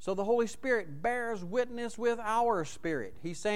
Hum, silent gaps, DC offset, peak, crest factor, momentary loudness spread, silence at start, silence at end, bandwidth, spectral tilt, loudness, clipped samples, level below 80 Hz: none; none; 0.8%; -18 dBFS; 16 dB; 7 LU; 0 s; 0 s; 13.5 kHz; -5 dB/octave; -32 LUFS; under 0.1%; -60 dBFS